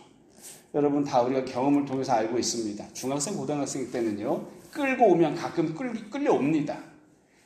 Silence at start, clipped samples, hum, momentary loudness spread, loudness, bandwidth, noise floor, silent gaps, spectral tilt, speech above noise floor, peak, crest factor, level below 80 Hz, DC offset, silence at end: 0 s; under 0.1%; none; 11 LU; -27 LUFS; 15 kHz; -58 dBFS; none; -5 dB/octave; 32 dB; -8 dBFS; 18 dB; -68 dBFS; under 0.1%; 0.55 s